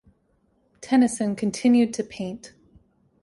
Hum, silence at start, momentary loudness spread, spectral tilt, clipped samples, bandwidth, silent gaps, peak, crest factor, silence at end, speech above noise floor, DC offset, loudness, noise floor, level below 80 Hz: none; 0.8 s; 16 LU; -5 dB/octave; under 0.1%; 11.5 kHz; none; -10 dBFS; 16 dB; 0.75 s; 44 dB; under 0.1%; -23 LUFS; -66 dBFS; -62 dBFS